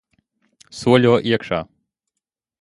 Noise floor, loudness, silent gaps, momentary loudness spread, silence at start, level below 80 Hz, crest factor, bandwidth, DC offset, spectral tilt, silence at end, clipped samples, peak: -83 dBFS; -18 LUFS; none; 22 LU; 0.75 s; -54 dBFS; 20 dB; 11.5 kHz; under 0.1%; -6.5 dB/octave; 1 s; under 0.1%; 0 dBFS